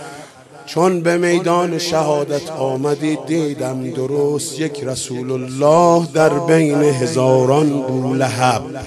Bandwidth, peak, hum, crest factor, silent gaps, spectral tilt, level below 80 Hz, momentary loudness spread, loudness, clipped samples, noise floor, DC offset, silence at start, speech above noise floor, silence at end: 14.5 kHz; 0 dBFS; none; 16 dB; none; -5.5 dB/octave; -54 dBFS; 10 LU; -16 LUFS; under 0.1%; -38 dBFS; under 0.1%; 0 s; 22 dB; 0 s